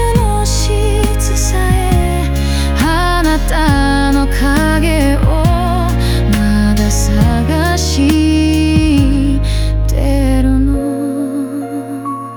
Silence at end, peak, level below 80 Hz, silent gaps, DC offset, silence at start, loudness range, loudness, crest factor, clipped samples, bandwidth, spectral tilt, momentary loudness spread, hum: 0 s; 0 dBFS; -16 dBFS; none; under 0.1%; 0 s; 2 LU; -13 LUFS; 12 dB; under 0.1%; over 20 kHz; -5.5 dB/octave; 5 LU; none